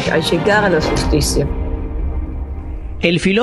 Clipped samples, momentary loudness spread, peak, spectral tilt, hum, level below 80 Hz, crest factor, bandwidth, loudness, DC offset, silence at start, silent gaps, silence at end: under 0.1%; 14 LU; 0 dBFS; -5 dB/octave; none; -24 dBFS; 16 dB; 13 kHz; -17 LUFS; under 0.1%; 0 s; none; 0 s